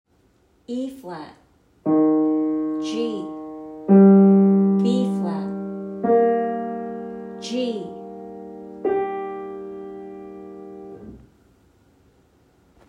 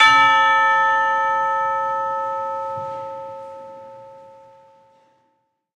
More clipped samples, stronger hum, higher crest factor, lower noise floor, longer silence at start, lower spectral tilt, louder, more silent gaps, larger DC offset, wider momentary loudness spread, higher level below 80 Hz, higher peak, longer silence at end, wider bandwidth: neither; neither; about the same, 18 dB vs 20 dB; second, -60 dBFS vs -68 dBFS; first, 0.7 s vs 0 s; first, -8.5 dB/octave vs -1.5 dB/octave; about the same, -20 LUFS vs -18 LUFS; neither; neither; about the same, 23 LU vs 23 LU; first, -64 dBFS vs -72 dBFS; second, -4 dBFS vs 0 dBFS; first, 1.7 s vs 1.55 s; second, 7.8 kHz vs 10 kHz